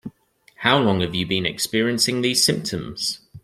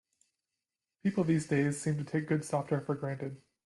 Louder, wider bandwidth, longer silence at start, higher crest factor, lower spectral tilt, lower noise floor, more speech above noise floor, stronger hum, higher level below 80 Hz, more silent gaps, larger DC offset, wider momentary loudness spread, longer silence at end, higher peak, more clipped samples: first, -20 LUFS vs -33 LUFS; first, 16 kHz vs 12 kHz; second, 0.05 s vs 1.05 s; about the same, 20 dB vs 16 dB; second, -3.5 dB/octave vs -7 dB/octave; second, -56 dBFS vs -90 dBFS; second, 34 dB vs 58 dB; neither; first, -54 dBFS vs -70 dBFS; neither; neither; about the same, 8 LU vs 8 LU; second, 0.05 s vs 0.3 s; first, -2 dBFS vs -18 dBFS; neither